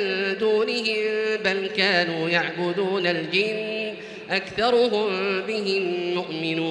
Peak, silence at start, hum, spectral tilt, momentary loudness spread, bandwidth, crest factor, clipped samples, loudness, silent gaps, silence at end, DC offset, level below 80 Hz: -6 dBFS; 0 s; none; -5 dB/octave; 7 LU; 10.5 kHz; 18 dB; under 0.1%; -23 LUFS; none; 0 s; under 0.1%; -64 dBFS